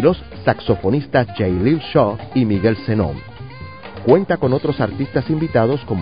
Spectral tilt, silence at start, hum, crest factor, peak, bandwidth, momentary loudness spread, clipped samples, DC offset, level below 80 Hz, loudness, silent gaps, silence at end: -12 dB/octave; 0 s; none; 18 dB; 0 dBFS; 5.2 kHz; 12 LU; under 0.1%; 0.7%; -38 dBFS; -18 LUFS; none; 0 s